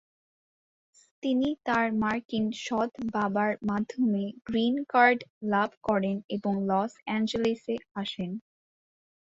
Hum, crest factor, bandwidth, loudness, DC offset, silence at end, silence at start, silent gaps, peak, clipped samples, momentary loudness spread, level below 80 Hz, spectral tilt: none; 20 dB; 7.8 kHz; -28 LUFS; under 0.1%; 0.8 s; 1.25 s; 2.25-2.29 s, 5.30-5.41 s, 5.77-5.81 s, 6.24-6.29 s, 7.91-7.95 s; -8 dBFS; under 0.1%; 9 LU; -64 dBFS; -6 dB/octave